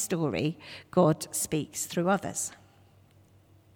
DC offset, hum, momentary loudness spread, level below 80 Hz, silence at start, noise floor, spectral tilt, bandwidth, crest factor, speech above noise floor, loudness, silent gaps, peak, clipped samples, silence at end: under 0.1%; none; 9 LU; -64 dBFS; 0 s; -59 dBFS; -5 dB/octave; over 20 kHz; 20 dB; 30 dB; -29 LUFS; none; -10 dBFS; under 0.1%; 1.2 s